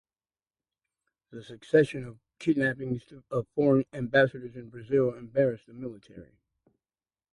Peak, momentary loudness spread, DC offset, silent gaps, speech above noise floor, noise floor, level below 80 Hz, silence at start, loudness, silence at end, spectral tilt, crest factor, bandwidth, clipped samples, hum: -10 dBFS; 21 LU; under 0.1%; none; over 62 dB; under -90 dBFS; -64 dBFS; 1.35 s; -27 LUFS; 1.1 s; -7.5 dB/octave; 20 dB; 11 kHz; under 0.1%; none